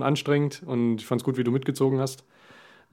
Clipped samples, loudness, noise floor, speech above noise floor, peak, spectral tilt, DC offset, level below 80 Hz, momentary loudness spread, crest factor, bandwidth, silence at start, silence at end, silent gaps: under 0.1%; -26 LUFS; -53 dBFS; 28 dB; -8 dBFS; -6.5 dB/octave; under 0.1%; -72 dBFS; 4 LU; 18 dB; 16.5 kHz; 0 s; 0.75 s; none